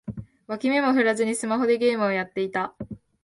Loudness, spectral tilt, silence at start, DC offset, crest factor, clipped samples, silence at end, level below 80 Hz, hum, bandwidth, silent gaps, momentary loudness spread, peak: -24 LUFS; -4.5 dB/octave; 0.05 s; under 0.1%; 16 dB; under 0.1%; 0.3 s; -58 dBFS; none; 11.5 kHz; none; 17 LU; -8 dBFS